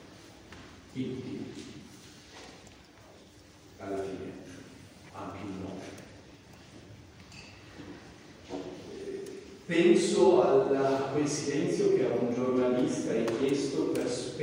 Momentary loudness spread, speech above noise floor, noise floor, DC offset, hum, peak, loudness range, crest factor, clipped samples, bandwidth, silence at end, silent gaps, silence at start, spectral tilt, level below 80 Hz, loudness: 27 LU; 27 dB; -55 dBFS; under 0.1%; none; -10 dBFS; 19 LU; 20 dB; under 0.1%; 16 kHz; 0 s; none; 0 s; -5.5 dB/octave; -66 dBFS; -29 LUFS